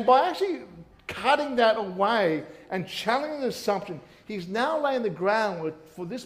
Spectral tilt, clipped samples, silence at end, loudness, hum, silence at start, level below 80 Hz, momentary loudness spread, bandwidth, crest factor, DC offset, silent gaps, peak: -5 dB/octave; under 0.1%; 0 s; -26 LUFS; none; 0 s; -64 dBFS; 15 LU; 15.5 kHz; 20 dB; under 0.1%; none; -8 dBFS